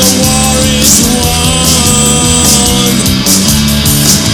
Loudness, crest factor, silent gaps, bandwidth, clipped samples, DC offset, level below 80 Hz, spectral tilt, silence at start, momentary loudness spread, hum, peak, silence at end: -6 LUFS; 8 dB; none; over 20 kHz; 2%; under 0.1%; -22 dBFS; -3 dB/octave; 0 s; 3 LU; none; 0 dBFS; 0 s